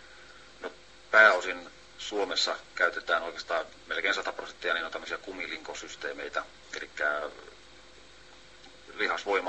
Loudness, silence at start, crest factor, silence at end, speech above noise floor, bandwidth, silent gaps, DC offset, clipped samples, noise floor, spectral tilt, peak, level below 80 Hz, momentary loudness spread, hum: -29 LUFS; 0 s; 24 dB; 0 s; 21 dB; 8.4 kHz; none; 0.1%; under 0.1%; -54 dBFS; -1 dB/octave; -6 dBFS; -64 dBFS; 19 LU; none